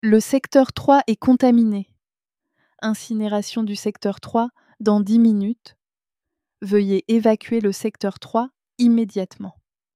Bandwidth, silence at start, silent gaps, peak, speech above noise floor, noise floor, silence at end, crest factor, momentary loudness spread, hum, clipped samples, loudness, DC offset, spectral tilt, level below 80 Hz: 14.5 kHz; 0.05 s; none; -2 dBFS; over 71 dB; under -90 dBFS; 0.45 s; 18 dB; 12 LU; none; under 0.1%; -20 LUFS; under 0.1%; -6 dB/octave; -60 dBFS